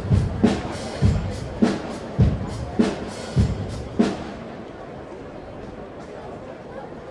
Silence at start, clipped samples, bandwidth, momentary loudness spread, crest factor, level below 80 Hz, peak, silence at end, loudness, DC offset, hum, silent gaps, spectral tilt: 0 s; under 0.1%; 11.5 kHz; 15 LU; 22 dB; -34 dBFS; -4 dBFS; 0 s; -24 LUFS; under 0.1%; none; none; -7.5 dB/octave